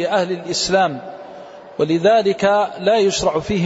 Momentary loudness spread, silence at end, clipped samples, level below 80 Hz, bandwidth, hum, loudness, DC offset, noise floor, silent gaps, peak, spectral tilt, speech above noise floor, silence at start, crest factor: 19 LU; 0 s; under 0.1%; -48 dBFS; 8 kHz; none; -17 LUFS; under 0.1%; -37 dBFS; none; -4 dBFS; -4.5 dB/octave; 20 dB; 0 s; 14 dB